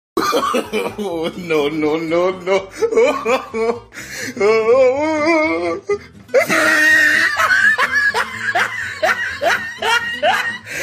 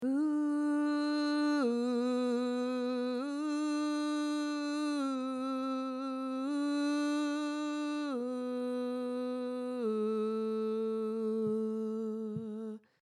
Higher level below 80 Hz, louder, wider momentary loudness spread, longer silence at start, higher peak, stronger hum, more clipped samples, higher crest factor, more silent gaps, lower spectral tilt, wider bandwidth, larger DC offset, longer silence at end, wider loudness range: first, -52 dBFS vs -90 dBFS; first, -16 LUFS vs -34 LUFS; first, 11 LU vs 5 LU; first, 0.15 s vs 0 s; first, -4 dBFS vs -22 dBFS; neither; neither; about the same, 14 dB vs 12 dB; neither; second, -3 dB/octave vs -5 dB/octave; first, 15.5 kHz vs 11 kHz; neither; second, 0 s vs 0.25 s; about the same, 5 LU vs 3 LU